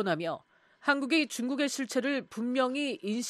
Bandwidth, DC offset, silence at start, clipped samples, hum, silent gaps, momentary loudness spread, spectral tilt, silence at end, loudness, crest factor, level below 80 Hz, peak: 14 kHz; under 0.1%; 0 s; under 0.1%; none; none; 6 LU; -3.5 dB/octave; 0 s; -30 LUFS; 18 dB; -84 dBFS; -12 dBFS